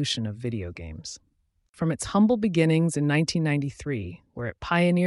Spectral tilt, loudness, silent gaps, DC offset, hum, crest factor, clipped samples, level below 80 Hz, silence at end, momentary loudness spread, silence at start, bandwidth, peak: -6 dB/octave; -25 LUFS; 1.69-1.73 s; under 0.1%; none; 16 dB; under 0.1%; -52 dBFS; 0 s; 16 LU; 0 s; 11.5 kHz; -10 dBFS